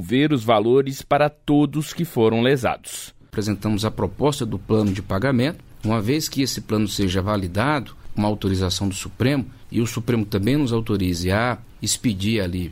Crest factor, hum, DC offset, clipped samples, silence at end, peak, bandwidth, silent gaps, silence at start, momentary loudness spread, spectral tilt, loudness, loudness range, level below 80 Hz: 16 dB; none; under 0.1%; under 0.1%; 0 s; -4 dBFS; 16 kHz; none; 0 s; 7 LU; -5.5 dB/octave; -22 LUFS; 2 LU; -44 dBFS